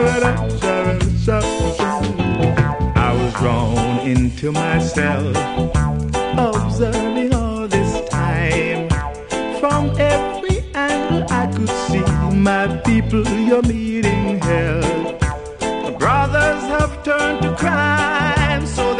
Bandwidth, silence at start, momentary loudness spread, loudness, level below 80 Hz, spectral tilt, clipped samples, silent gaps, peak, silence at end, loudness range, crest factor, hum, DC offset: 10.5 kHz; 0 s; 4 LU; -18 LUFS; -28 dBFS; -6 dB/octave; under 0.1%; none; -2 dBFS; 0 s; 2 LU; 16 dB; none; under 0.1%